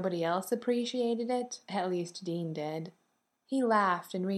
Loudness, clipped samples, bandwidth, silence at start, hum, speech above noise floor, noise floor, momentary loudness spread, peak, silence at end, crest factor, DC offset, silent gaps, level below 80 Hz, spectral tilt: -32 LUFS; under 0.1%; 15 kHz; 0 s; none; 40 dB; -72 dBFS; 9 LU; -14 dBFS; 0 s; 18 dB; under 0.1%; none; -88 dBFS; -5.5 dB/octave